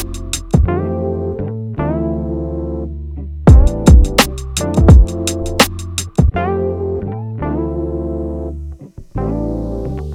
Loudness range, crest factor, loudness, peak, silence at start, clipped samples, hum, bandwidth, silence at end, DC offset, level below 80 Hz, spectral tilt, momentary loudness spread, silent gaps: 9 LU; 14 dB; -16 LUFS; 0 dBFS; 0 s; under 0.1%; none; 16 kHz; 0 s; under 0.1%; -18 dBFS; -6 dB/octave; 15 LU; none